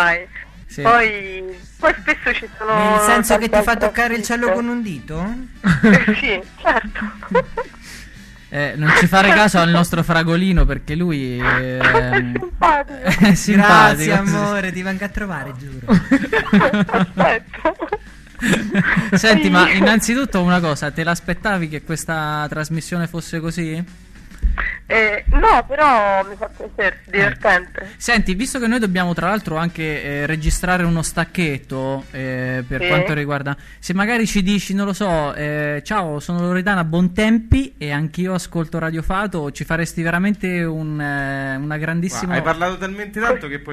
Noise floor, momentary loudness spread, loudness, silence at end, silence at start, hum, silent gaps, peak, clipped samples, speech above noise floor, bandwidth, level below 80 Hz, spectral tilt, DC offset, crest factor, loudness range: -39 dBFS; 13 LU; -17 LUFS; 0 s; 0 s; none; none; 0 dBFS; under 0.1%; 22 dB; 14 kHz; -30 dBFS; -5 dB/octave; under 0.1%; 18 dB; 6 LU